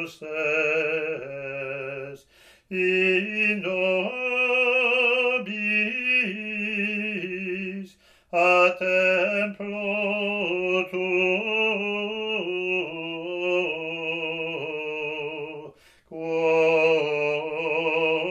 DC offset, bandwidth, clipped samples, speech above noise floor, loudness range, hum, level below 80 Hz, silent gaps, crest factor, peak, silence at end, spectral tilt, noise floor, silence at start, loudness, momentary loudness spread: under 0.1%; 10.5 kHz; under 0.1%; 23 dB; 6 LU; none; -70 dBFS; none; 18 dB; -6 dBFS; 0 s; -5 dB/octave; -48 dBFS; 0 s; -24 LUFS; 12 LU